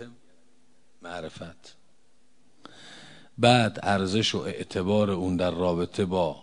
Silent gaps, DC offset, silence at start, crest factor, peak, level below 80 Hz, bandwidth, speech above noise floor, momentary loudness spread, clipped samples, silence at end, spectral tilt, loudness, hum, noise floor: none; 0.3%; 0 s; 22 dB; -6 dBFS; -62 dBFS; 11 kHz; 41 dB; 25 LU; under 0.1%; 0 s; -5.5 dB/octave; -25 LUFS; none; -67 dBFS